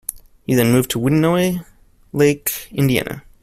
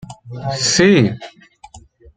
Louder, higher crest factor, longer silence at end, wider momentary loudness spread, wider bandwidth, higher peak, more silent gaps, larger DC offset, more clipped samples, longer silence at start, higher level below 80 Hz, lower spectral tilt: second, -18 LUFS vs -14 LUFS; about the same, 16 dB vs 16 dB; about the same, 0.25 s vs 0.35 s; second, 14 LU vs 20 LU; first, 16 kHz vs 9.6 kHz; about the same, -2 dBFS vs -2 dBFS; neither; neither; neither; about the same, 0.1 s vs 0.1 s; about the same, -46 dBFS vs -50 dBFS; first, -5.5 dB/octave vs -4 dB/octave